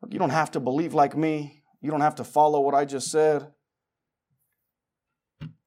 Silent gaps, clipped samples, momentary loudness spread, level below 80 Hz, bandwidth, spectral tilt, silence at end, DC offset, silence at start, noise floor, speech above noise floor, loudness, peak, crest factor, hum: none; under 0.1%; 13 LU; -72 dBFS; 15.5 kHz; -5.5 dB/octave; 0.2 s; under 0.1%; 0 s; -86 dBFS; 62 dB; -24 LUFS; -8 dBFS; 18 dB; none